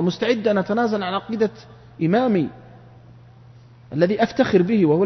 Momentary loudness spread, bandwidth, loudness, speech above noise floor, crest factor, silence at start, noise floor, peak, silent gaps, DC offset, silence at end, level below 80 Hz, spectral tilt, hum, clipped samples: 8 LU; 6.4 kHz; -21 LUFS; 27 dB; 18 dB; 0 s; -46 dBFS; -2 dBFS; none; under 0.1%; 0 s; -58 dBFS; -7.5 dB/octave; none; under 0.1%